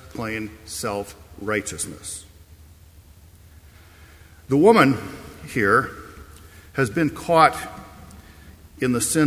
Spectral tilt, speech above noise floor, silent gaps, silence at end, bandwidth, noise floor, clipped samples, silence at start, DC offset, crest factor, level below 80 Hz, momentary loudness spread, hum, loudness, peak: -4.5 dB/octave; 28 dB; none; 0 s; 16 kHz; -48 dBFS; under 0.1%; 0.05 s; under 0.1%; 22 dB; -48 dBFS; 21 LU; none; -21 LUFS; -2 dBFS